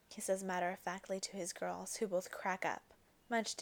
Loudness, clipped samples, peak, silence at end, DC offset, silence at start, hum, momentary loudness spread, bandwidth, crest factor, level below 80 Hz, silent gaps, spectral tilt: -41 LUFS; under 0.1%; -24 dBFS; 0 s; under 0.1%; 0.1 s; none; 4 LU; over 20 kHz; 18 dB; -78 dBFS; none; -3 dB/octave